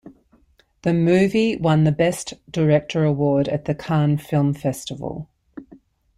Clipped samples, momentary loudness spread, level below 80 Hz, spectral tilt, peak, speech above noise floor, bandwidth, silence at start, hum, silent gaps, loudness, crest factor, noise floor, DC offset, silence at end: under 0.1%; 13 LU; -52 dBFS; -7 dB/octave; -4 dBFS; 39 dB; 14 kHz; 0.05 s; none; none; -20 LUFS; 16 dB; -58 dBFS; under 0.1%; 0.4 s